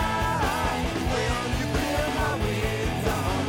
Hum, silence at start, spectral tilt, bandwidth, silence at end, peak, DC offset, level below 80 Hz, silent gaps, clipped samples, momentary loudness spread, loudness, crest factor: none; 0 s; -5 dB/octave; 17.5 kHz; 0 s; -14 dBFS; under 0.1%; -34 dBFS; none; under 0.1%; 2 LU; -26 LUFS; 12 dB